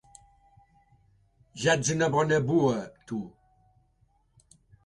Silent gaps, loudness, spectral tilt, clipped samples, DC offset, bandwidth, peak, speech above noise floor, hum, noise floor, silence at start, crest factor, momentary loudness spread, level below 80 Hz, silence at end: none; -27 LUFS; -5 dB/octave; under 0.1%; under 0.1%; 11.5 kHz; -10 dBFS; 42 dB; none; -67 dBFS; 1.55 s; 20 dB; 13 LU; -62 dBFS; 1.55 s